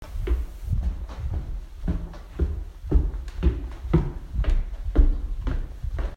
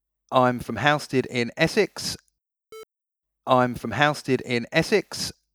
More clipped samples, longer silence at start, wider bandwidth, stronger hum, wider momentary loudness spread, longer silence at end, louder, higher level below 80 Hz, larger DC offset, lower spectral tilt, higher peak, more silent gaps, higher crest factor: neither; second, 0 s vs 0.3 s; second, 6.6 kHz vs over 20 kHz; neither; about the same, 9 LU vs 9 LU; second, 0 s vs 0.25 s; second, -29 LUFS vs -23 LUFS; first, -26 dBFS vs -56 dBFS; neither; first, -8.5 dB/octave vs -4.5 dB/octave; second, -6 dBFS vs -2 dBFS; neither; about the same, 20 dB vs 22 dB